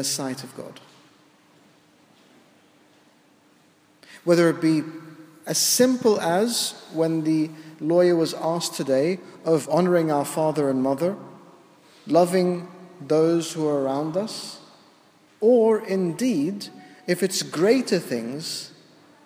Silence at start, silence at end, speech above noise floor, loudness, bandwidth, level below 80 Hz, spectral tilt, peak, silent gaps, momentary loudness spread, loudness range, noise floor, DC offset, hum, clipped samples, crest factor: 0 s; 0.55 s; 36 dB; -22 LUFS; 16 kHz; -78 dBFS; -4.5 dB/octave; -6 dBFS; none; 16 LU; 5 LU; -58 dBFS; under 0.1%; none; under 0.1%; 18 dB